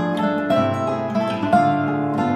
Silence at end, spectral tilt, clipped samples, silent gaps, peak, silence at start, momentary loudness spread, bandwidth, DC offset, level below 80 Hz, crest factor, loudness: 0 s; -7.5 dB/octave; under 0.1%; none; -4 dBFS; 0 s; 5 LU; 12.5 kHz; under 0.1%; -58 dBFS; 16 dB; -20 LUFS